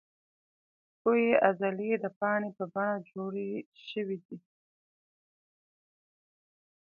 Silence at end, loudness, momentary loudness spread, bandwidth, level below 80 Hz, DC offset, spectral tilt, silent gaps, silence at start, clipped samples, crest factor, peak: 2.45 s; -31 LUFS; 15 LU; 4.9 kHz; -82 dBFS; under 0.1%; -9 dB/octave; 2.16-2.21 s, 3.66-3.72 s, 4.25-4.29 s; 1.05 s; under 0.1%; 26 dB; -8 dBFS